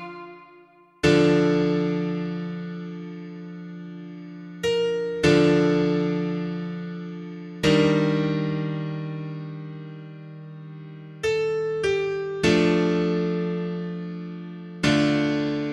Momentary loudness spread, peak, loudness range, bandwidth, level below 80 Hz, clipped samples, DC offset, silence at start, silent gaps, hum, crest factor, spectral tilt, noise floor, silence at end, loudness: 20 LU; -6 dBFS; 7 LU; 11.5 kHz; -52 dBFS; under 0.1%; under 0.1%; 0 s; none; none; 18 dB; -6.5 dB/octave; -53 dBFS; 0 s; -23 LUFS